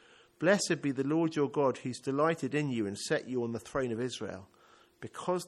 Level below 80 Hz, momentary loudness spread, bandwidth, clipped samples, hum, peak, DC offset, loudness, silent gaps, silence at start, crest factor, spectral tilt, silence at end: -68 dBFS; 11 LU; 13 kHz; under 0.1%; none; -14 dBFS; under 0.1%; -32 LUFS; none; 0.4 s; 18 dB; -5 dB/octave; 0 s